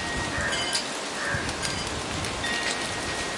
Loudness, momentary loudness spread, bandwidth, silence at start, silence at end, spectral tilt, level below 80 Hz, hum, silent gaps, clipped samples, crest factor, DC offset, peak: -27 LUFS; 4 LU; 11.5 kHz; 0 s; 0 s; -2.5 dB/octave; -46 dBFS; none; none; under 0.1%; 18 dB; under 0.1%; -10 dBFS